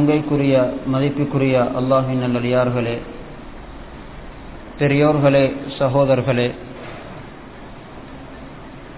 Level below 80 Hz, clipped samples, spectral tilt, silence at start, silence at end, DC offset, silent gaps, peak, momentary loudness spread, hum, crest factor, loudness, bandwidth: -42 dBFS; under 0.1%; -11.5 dB/octave; 0 s; 0 s; 0.4%; none; -4 dBFS; 22 LU; none; 16 dB; -18 LUFS; 4 kHz